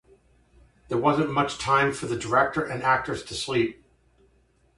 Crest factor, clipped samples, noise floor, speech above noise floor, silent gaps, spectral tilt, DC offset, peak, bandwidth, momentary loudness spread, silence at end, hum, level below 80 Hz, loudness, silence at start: 20 dB; under 0.1%; -63 dBFS; 39 dB; none; -5 dB/octave; under 0.1%; -8 dBFS; 11.5 kHz; 8 LU; 1.05 s; none; -54 dBFS; -25 LUFS; 0.9 s